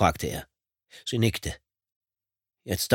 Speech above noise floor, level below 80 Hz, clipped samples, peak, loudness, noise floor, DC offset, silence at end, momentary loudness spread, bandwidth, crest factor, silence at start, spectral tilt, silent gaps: over 63 dB; -48 dBFS; under 0.1%; -6 dBFS; -29 LUFS; under -90 dBFS; under 0.1%; 0 s; 15 LU; 17.5 kHz; 24 dB; 0 s; -4.5 dB/octave; 1.96-2.01 s